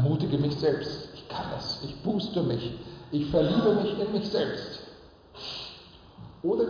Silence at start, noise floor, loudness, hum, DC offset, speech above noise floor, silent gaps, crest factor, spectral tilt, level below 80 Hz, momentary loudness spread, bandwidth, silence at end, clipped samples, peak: 0 s; -50 dBFS; -29 LUFS; none; under 0.1%; 23 dB; none; 16 dB; -7.5 dB/octave; -54 dBFS; 17 LU; 5.2 kHz; 0 s; under 0.1%; -12 dBFS